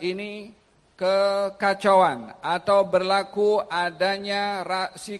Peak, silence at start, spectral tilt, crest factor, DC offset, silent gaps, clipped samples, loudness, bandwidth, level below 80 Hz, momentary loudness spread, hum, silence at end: -6 dBFS; 0 s; -4.5 dB/octave; 16 dB; under 0.1%; none; under 0.1%; -23 LUFS; 12 kHz; -66 dBFS; 10 LU; none; 0 s